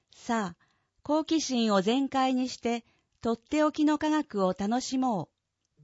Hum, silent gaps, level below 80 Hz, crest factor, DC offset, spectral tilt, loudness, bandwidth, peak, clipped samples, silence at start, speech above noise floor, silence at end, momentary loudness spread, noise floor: none; none; -64 dBFS; 18 dB; under 0.1%; -4.5 dB/octave; -29 LUFS; 8 kHz; -12 dBFS; under 0.1%; 0.2 s; 42 dB; 0.6 s; 10 LU; -70 dBFS